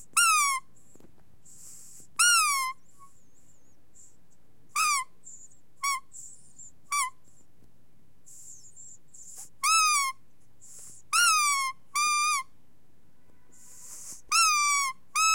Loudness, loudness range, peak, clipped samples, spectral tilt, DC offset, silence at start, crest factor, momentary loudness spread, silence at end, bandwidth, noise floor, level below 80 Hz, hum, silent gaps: -25 LUFS; 10 LU; -8 dBFS; under 0.1%; 3.5 dB/octave; 0.5%; 0.15 s; 22 dB; 26 LU; 0 s; 16.5 kHz; -65 dBFS; -72 dBFS; none; none